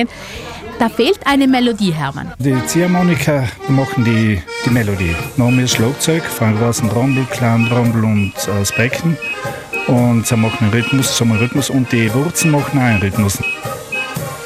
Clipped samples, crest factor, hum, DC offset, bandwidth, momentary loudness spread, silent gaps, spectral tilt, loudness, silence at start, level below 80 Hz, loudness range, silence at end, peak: under 0.1%; 14 dB; none; under 0.1%; 15.5 kHz; 7 LU; none; -5 dB/octave; -15 LUFS; 0 s; -40 dBFS; 1 LU; 0 s; 0 dBFS